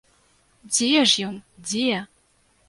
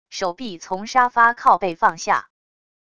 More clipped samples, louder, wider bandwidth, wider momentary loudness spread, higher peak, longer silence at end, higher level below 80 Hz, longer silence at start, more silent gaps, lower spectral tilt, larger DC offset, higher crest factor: neither; about the same, -21 LUFS vs -19 LUFS; about the same, 11.5 kHz vs 11 kHz; about the same, 14 LU vs 14 LU; about the same, -4 dBFS vs -2 dBFS; about the same, 0.65 s vs 0.75 s; second, -66 dBFS vs -60 dBFS; first, 0.65 s vs 0.1 s; neither; about the same, -2 dB/octave vs -3 dB/octave; second, under 0.1% vs 0.4%; about the same, 22 dB vs 18 dB